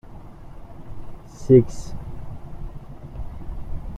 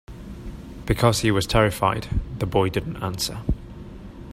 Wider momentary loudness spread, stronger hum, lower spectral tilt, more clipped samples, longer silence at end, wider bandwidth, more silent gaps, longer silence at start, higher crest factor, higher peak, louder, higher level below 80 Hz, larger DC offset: first, 28 LU vs 21 LU; neither; first, -9 dB/octave vs -5 dB/octave; neither; about the same, 0 s vs 0 s; second, 9.2 kHz vs 16 kHz; neither; about the same, 0.05 s vs 0.1 s; about the same, 22 dB vs 22 dB; about the same, -4 dBFS vs -2 dBFS; first, -17 LUFS vs -23 LUFS; about the same, -36 dBFS vs -34 dBFS; neither